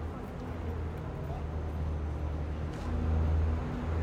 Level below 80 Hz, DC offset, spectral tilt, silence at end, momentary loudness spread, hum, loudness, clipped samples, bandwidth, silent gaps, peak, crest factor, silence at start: -38 dBFS; under 0.1%; -8.5 dB/octave; 0 s; 8 LU; none; -35 LUFS; under 0.1%; 7 kHz; none; -20 dBFS; 12 dB; 0 s